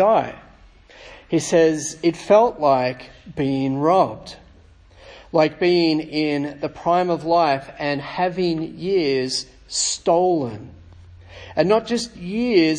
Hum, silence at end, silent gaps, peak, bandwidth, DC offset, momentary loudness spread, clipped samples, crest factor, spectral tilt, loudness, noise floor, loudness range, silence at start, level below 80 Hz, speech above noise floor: none; 0 s; none; -2 dBFS; 10.5 kHz; under 0.1%; 10 LU; under 0.1%; 18 dB; -4.5 dB/octave; -20 LUFS; -49 dBFS; 3 LU; 0 s; -52 dBFS; 29 dB